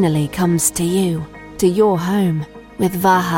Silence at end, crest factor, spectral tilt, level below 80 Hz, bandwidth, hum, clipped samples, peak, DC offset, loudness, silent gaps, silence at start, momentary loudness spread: 0 s; 14 dB; -5.5 dB/octave; -44 dBFS; 17 kHz; none; under 0.1%; -2 dBFS; under 0.1%; -17 LUFS; none; 0 s; 10 LU